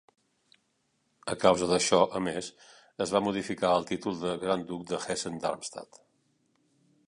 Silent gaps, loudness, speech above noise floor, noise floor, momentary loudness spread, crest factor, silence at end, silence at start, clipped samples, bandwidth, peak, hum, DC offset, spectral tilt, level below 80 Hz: none; -29 LUFS; 46 dB; -75 dBFS; 14 LU; 24 dB; 1.25 s; 1.25 s; under 0.1%; 11.5 kHz; -8 dBFS; none; under 0.1%; -4 dB/octave; -64 dBFS